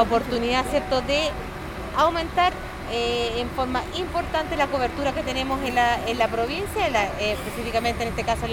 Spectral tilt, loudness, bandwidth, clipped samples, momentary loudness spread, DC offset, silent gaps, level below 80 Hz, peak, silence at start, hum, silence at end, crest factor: -4.5 dB/octave; -24 LUFS; over 20 kHz; under 0.1%; 6 LU; under 0.1%; none; -38 dBFS; -6 dBFS; 0 s; none; 0 s; 18 dB